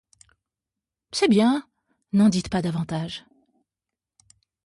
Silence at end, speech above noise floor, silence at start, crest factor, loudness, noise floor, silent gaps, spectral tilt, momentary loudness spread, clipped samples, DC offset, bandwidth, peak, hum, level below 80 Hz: 1.5 s; 67 dB; 1.15 s; 18 dB; -23 LUFS; -88 dBFS; none; -6 dB/octave; 13 LU; under 0.1%; under 0.1%; 11.5 kHz; -8 dBFS; none; -56 dBFS